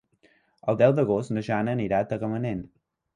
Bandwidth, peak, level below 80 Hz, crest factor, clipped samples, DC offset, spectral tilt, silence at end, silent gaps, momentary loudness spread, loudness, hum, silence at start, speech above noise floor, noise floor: 10.5 kHz; -8 dBFS; -56 dBFS; 18 dB; under 0.1%; under 0.1%; -8.5 dB/octave; 0.5 s; none; 11 LU; -26 LUFS; none; 0.65 s; 39 dB; -63 dBFS